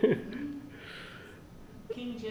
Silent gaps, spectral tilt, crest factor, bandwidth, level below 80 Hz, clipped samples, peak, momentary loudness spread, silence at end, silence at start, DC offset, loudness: none; -7 dB/octave; 24 dB; over 20 kHz; -60 dBFS; under 0.1%; -12 dBFS; 18 LU; 0 s; 0 s; under 0.1%; -38 LUFS